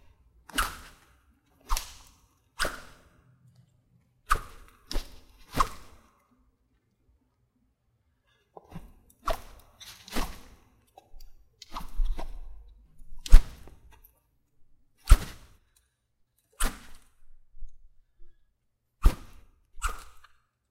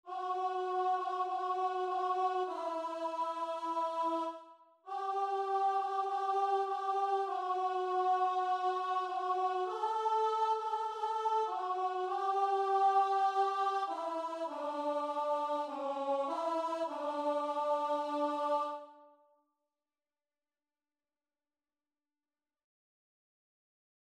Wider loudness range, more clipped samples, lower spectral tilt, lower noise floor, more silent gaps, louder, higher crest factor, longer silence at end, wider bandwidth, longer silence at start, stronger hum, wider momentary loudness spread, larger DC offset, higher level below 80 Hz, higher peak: first, 12 LU vs 4 LU; neither; first, -4 dB/octave vs -2.5 dB/octave; second, -75 dBFS vs under -90 dBFS; neither; about the same, -32 LUFS vs -34 LUFS; first, 28 dB vs 16 dB; second, 0.7 s vs 5.05 s; first, 15.5 kHz vs 10.5 kHz; first, 0.55 s vs 0.05 s; neither; first, 28 LU vs 6 LU; neither; first, -32 dBFS vs -88 dBFS; first, -2 dBFS vs -20 dBFS